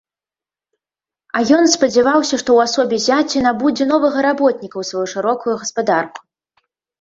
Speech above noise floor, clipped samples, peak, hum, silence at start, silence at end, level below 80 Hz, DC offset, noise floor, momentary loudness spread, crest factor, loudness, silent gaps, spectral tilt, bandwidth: over 75 dB; under 0.1%; 0 dBFS; none; 1.35 s; 0.8 s; -58 dBFS; under 0.1%; under -90 dBFS; 9 LU; 16 dB; -16 LUFS; none; -3 dB/octave; 7.8 kHz